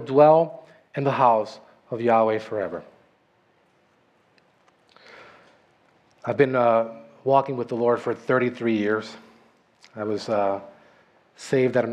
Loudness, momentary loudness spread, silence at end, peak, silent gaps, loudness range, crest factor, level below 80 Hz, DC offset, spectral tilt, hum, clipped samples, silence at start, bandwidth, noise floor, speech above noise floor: -23 LUFS; 16 LU; 0 s; -4 dBFS; none; 7 LU; 20 dB; -74 dBFS; under 0.1%; -7 dB/octave; none; under 0.1%; 0 s; 10 kHz; -63 dBFS; 42 dB